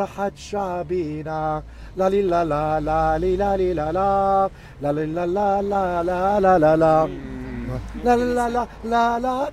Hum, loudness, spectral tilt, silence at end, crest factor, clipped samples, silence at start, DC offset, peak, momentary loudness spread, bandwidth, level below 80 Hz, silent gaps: none; -21 LUFS; -7 dB/octave; 0 s; 16 dB; under 0.1%; 0 s; under 0.1%; -4 dBFS; 11 LU; 14.5 kHz; -38 dBFS; none